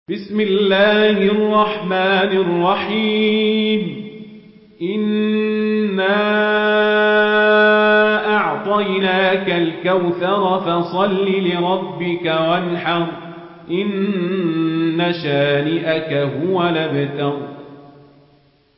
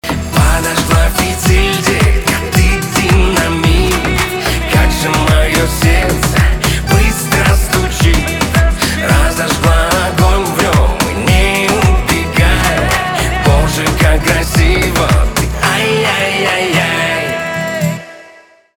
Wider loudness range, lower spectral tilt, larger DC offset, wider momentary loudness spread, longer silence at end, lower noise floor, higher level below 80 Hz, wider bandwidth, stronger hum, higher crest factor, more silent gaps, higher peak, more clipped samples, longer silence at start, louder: first, 5 LU vs 1 LU; first, -11 dB/octave vs -4.5 dB/octave; second, under 0.1% vs 1%; first, 9 LU vs 3 LU; first, 0.9 s vs 0.45 s; first, -54 dBFS vs -41 dBFS; second, -62 dBFS vs -16 dBFS; second, 5.8 kHz vs 19.5 kHz; neither; about the same, 14 dB vs 12 dB; neither; second, -4 dBFS vs 0 dBFS; neither; about the same, 0.1 s vs 0.05 s; second, -17 LUFS vs -12 LUFS